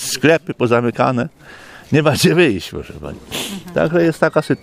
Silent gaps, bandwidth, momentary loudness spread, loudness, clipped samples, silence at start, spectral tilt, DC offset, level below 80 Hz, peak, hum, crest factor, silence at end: none; 15.5 kHz; 14 LU; -16 LUFS; under 0.1%; 0 s; -5 dB/octave; under 0.1%; -46 dBFS; 0 dBFS; none; 16 dB; 0.05 s